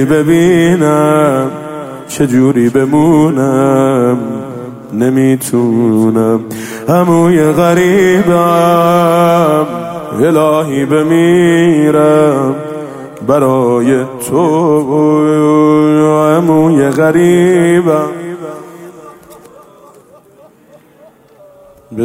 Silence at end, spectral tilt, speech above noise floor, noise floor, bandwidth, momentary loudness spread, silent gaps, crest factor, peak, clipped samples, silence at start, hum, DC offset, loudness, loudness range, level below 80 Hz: 0 s; -7 dB/octave; 34 dB; -42 dBFS; 16 kHz; 13 LU; none; 10 dB; 0 dBFS; under 0.1%; 0 s; none; under 0.1%; -10 LUFS; 3 LU; -48 dBFS